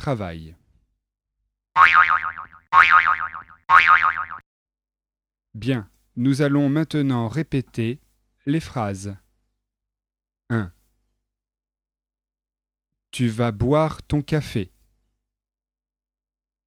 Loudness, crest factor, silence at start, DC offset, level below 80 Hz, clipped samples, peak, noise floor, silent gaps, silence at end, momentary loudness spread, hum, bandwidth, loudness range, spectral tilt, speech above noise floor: -19 LUFS; 22 dB; 0 s; under 0.1%; -50 dBFS; under 0.1%; 0 dBFS; under -90 dBFS; 4.46-4.66 s; 2 s; 22 LU; none; 14 kHz; 17 LU; -6 dB/octave; over 69 dB